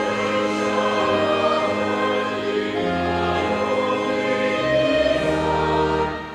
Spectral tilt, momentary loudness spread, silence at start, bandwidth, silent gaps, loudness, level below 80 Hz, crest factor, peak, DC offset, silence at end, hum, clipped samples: -5.5 dB/octave; 4 LU; 0 s; 12.5 kHz; none; -21 LUFS; -44 dBFS; 14 dB; -6 dBFS; under 0.1%; 0 s; none; under 0.1%